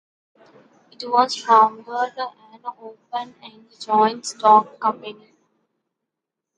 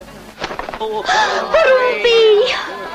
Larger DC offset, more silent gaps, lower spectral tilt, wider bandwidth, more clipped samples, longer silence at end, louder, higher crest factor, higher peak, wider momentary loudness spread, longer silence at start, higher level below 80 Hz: neither; neither; about the same, -3 dB/octave vs -2 dB/octave; second, 10.5 kHz vs 13 kHz; neither; first, 1.45 s vs 0 s; second, -19 LUFS vs -14 LUFS; first, 20 dB vs 12 dB; about the same, -2 dBFS vs -4 dBFS; first, 21 LU vs 14 LU; first, 1 s vs 0 s; second, -78 dBFS vs -46 dBFS